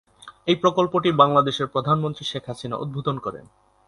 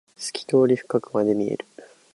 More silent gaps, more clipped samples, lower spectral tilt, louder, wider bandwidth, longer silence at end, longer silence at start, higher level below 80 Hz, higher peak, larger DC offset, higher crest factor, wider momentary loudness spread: neither; neither; about the same, -6.5 dB/octave vs -5.5 dB/octave; about the same, -22 LUFS vs -23 LUFS; about the same, 11.5 kHz vs 11.5 kHz; first, 0.5 s vs 0.3 s; about the same, 0.25 s vs 0.2 s; first, -58 dBFS vs -68 dBFS; first, 0 dBFS vs -6 dBFS; neither; about the same, 22 dB vs 18 dB; about the same, 14 LU vs 13 LU